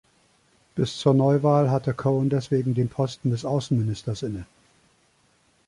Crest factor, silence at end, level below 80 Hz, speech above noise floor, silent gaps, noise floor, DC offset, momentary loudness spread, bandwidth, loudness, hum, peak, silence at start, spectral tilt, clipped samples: 18 dB; 1.25 s; -56 dBFS; 41 dB; none; -63 dBFS; under 0.1%; 11 LU; 11 kHz; -24 LUFS; none; -6 dBFS; 0.75 s; -7.5 dB/octave; under 0.1%